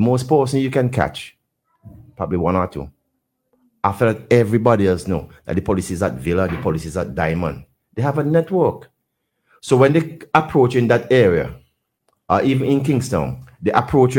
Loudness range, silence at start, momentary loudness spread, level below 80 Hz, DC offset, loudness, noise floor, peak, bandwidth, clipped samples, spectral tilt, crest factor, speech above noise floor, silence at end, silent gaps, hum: 5 LU; 0 s; 12 LU; -46 dBFS; under 0.1%; -18 LUFS; -74 dBFS; 0 dBFS; 17.5 kHz; under 0.1%; -7 dB/octave; 18 dB; 56 dB; 0 s; none; none